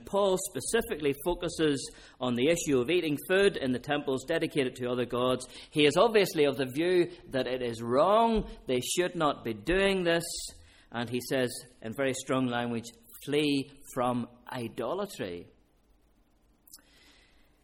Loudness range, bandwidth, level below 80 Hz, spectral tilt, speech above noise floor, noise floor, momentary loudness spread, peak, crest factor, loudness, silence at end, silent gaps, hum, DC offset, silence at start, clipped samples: 7 LU; 17 kHz; -54 dBFS; -4.5 dB/octave; 37 dB; -66 dBFS; 12 LU; -10 dBFS; 20 dB; -29 LUFS; 0.85 s; none; none; under 0.1%; 0 s; under 0.1%